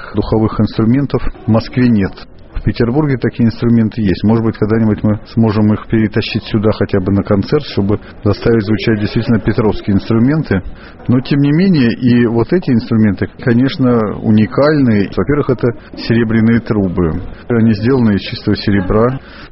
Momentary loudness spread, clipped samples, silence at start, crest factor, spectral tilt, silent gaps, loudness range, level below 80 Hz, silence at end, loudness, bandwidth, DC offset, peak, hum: 6 LU; under 0.1%; 0 s; 12 dB; -7 dB/octave; none; 2 LU; -30 dBFS; 0.05 s; -13 LUFS; 5.8 kHz; under 0.1%; 0 dBFS; none